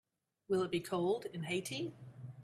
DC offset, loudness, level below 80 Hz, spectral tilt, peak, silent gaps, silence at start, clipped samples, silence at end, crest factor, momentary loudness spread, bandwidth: under 0.1%; -38 LUFS; -76 dBFS; -5 dB/octave; -24 dBFS; none; 0.5 s; under 0.1%; 0 s; 16 dB; 11 LU; 14 kHz